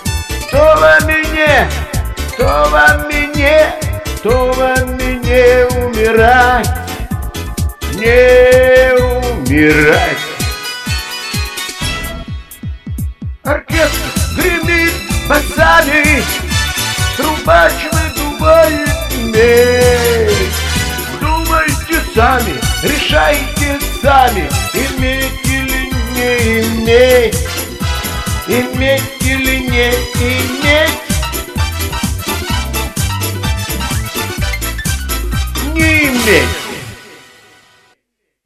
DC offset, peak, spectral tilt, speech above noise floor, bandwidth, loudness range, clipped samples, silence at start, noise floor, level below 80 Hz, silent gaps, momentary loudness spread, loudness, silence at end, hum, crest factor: under 0.1%; 0 dBFS; -4 dB/octave; 60 dB; 15.5 kHz; 7 LU; 0.1%; 0 s; -70 dBFS; -22 dBFS; none; 11 LU; -12 LUFS; 1.3 s; none; 12 dB